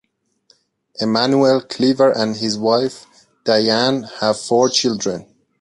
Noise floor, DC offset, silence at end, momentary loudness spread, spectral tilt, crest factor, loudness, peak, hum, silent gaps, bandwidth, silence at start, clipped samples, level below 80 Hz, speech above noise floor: -59 dBFS; under 0.1%; 0.4 s; 10 LU; -4 dB/octave; 16 dB; -17 LUFS; -2 dBFS; none; none; 11.5 kHz; 1 s; under 0.1%; -60 dBFS; 42 dB